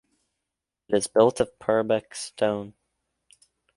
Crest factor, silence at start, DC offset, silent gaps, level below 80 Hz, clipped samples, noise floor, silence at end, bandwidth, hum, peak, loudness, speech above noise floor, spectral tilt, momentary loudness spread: 22 dB; 0.9 s; under 0.1%; none; -60 dBFS; under 0.1%; -85 dBFS; 1.05 s; 11.5 kHz; none; -4 dBFS; -24 LUFS; 62 dB; -4.5 dB/octave; 13 LU